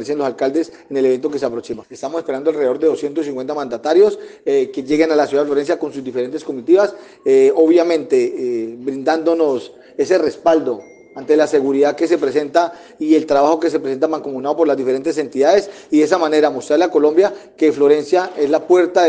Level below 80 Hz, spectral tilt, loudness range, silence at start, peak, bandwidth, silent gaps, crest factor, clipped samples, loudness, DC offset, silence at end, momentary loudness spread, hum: -64 dBFS; -5 dB/octave; 3 LU; 0 s; 0 dBFS; 9.4 kHz; none; 16 dB; under 0.1%; -16 LUFS; under 0.1%; 0 s; 10 LU; none